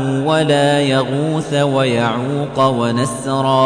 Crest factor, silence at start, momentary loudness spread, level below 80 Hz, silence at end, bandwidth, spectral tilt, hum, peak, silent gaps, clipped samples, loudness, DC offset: 12 dB; 0 s; 5 LU; -50 dBFS; 0 s; 10.5 kHz; -5.5 dB/octave; none; -2 dBFS; none; under 0.1%; -16 LUFS; under 0.1%